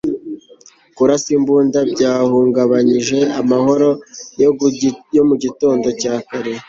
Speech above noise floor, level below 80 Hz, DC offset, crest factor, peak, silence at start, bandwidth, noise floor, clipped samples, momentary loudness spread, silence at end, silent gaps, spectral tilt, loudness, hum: 31 dB; -54 dBFS; under 0.1%; 14 dB; -2 dBFS; 0.05 s; 7.6 kHz; -46 dBFS; under 0.1%; 10 LU; 0.05 s; none; -5.5 dB/octave; -15 LUFS; none